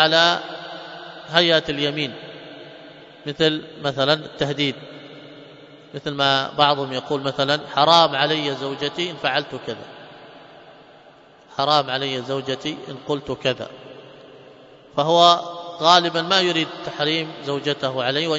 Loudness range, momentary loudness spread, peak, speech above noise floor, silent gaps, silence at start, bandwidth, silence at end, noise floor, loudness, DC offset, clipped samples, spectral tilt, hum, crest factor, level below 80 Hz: 7 LU; 21 LU; 0 dBFS; 28 dB; none; 0 s; 8 kHz; 0 s; -49 dBFS; -20 LUFS; under 0.1%; under 0.1%; -4 dB/octave; none; 22 dB; -60 dBFS